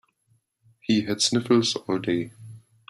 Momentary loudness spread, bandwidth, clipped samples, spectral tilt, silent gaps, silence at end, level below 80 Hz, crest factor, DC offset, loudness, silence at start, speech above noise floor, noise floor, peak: 10 LU; 14 kHz; under 0.1%; -4 dB/octave; none; 0.3 s; -64 dBFS; 18 dB; under 0.1%; -24 LUFS; 0.9 s; 45 dB; -68 dBFS; -8 dBFS